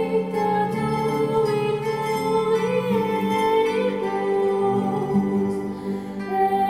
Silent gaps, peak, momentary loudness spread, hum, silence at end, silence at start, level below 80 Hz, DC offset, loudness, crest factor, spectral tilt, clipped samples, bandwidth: none; -10 dBFS; 5 LU; none; 0 s; 0 s; -56 dBFS; under 0.1%; -23 LUFS; 12 dB; -7 dB/octave; under 0.1%; 16 kHz